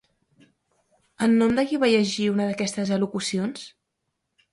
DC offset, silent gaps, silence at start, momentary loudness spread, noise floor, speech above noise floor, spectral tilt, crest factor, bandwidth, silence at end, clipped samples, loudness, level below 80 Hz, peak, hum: under 0.1%; none; 1.2 s; 9 LU; -79 dBFS; 56 dB; -5 dB/octave; 16 dB; 11.5 kHz; 0.85 s; under 0.1%; -23 LUFS; -60 dBFS; -8 dBFS; none